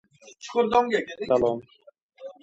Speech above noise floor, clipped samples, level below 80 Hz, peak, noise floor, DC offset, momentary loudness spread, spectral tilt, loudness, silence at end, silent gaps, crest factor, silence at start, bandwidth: 22 dB; under 0.1%; -60 dBFS; -6 dBFS; -45 dBFS; under 0.1%; 22 LU; -5 dB/octave; -25 LUFS; 0.1 s; 2.02-2.09 s; 20 dB; 0.25 s; 8 kHz